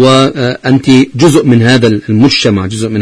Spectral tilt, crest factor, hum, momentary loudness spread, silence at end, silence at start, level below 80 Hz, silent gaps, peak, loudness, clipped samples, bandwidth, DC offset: -5.5 dB/octave; 8 dB; none; 6 LU; 0 s; 0 s; -40 dBFS; none; 0 dBFS; -8 LUFS; 2%; 11 kHz; under 0.1%